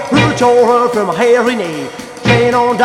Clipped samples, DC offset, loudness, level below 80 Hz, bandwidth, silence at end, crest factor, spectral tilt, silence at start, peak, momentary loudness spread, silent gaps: under 0.1%; under 0.1%; -11 LUFS; -42 dBFS; 13 kHz; 0 s; 12 dB; -5.5 dB/octave; 0 s; 0 dBFS; 10 LU; none